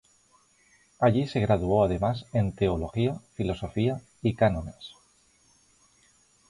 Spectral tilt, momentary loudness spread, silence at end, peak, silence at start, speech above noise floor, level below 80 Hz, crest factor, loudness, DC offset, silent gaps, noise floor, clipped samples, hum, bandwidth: -8 dB/octave; 9 LU; 1.6 s; -10 dBFS; 1 s; 37 dB; -46 dBFS; 18 dB; -27 LUFS; under 0.1%; none; -63 dBFS; under 0.1%; none; 11.5 kHz